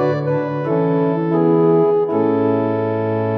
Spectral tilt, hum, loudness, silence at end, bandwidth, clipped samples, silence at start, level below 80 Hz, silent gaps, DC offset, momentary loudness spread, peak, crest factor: -10.5 dB/octave; none; -17 LUFS; 0 s; 5.2 kHz; under 0.1%; 0 s; -60 dBFS; none; under 0.1%; 6 LU; -4 dBFS; 12 dB